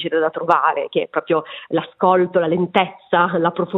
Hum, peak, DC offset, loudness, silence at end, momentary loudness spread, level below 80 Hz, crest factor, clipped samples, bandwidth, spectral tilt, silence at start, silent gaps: none; 0 dBFS; under 0.1%; -18 LUFS; 0 s; 6 LU; -64 dBFS; 18 dB; under 0.1%; 5.6 kHz; -8 dB/octave; 0 s; none